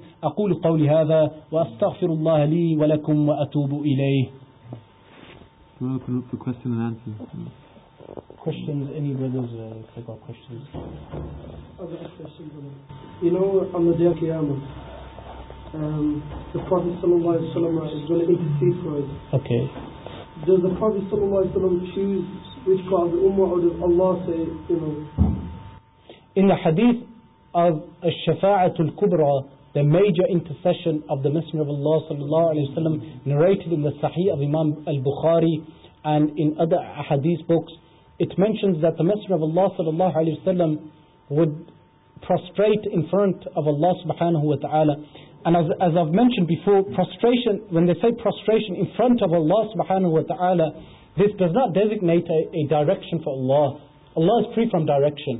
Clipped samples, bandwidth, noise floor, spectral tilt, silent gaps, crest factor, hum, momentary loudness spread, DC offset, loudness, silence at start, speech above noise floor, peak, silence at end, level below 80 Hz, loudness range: under 0.1%; 4 kHz; -49 dBFS; -12.5 dB/octave; none; 16 dB; none; 17 LU; under 0.1%; -22 LUFS; 0 s; 28 dB; -6 dBFS; 0 s; -46 dBFS; 10 LU